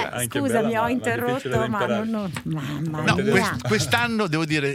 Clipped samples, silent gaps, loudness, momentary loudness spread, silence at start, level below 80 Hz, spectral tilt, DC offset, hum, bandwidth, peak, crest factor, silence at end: under 0.1%; none; -23 LUFS; 8 LU; 0 s; -52 dBFS; -5 dB/octave; under 0.1%; none; 16.5 kHz; -2 dBFS; 20 dB; 0 s